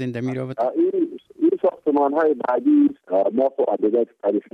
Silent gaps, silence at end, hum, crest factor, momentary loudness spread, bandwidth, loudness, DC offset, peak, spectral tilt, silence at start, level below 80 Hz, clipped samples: none; 0.15 s; none; 12 dB; 7 LU; 6 kHz; -21 LUFS; under 0.1%; -8 dBFS; -9 dB/octave; 0 s; -70 dBFS; under 0.1%